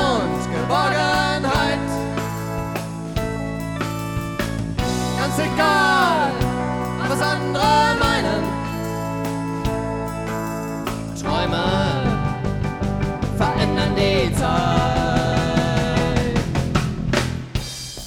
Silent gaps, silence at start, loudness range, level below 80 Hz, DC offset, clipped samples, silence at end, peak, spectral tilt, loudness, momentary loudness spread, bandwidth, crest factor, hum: none; 0 s; 6 LU; -34 dBFS; under 0.1%; under 0.1%; 0 s; -4 dBFS; -5.5 dB/octave; -21 LUFS; 9 LU; 19 kHz; 18 dB; none